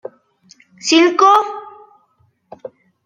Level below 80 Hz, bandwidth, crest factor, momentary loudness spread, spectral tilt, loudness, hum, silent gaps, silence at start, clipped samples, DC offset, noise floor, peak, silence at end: -74 dBFS; 9.4 kHz; 18 dB; 26 LU; -1.5 dB/octave; -13 LUFS; none; none; 0.85 s; under 0.1%; under 0.1%; -60 dBFS; 0 dBFS; 0.4 s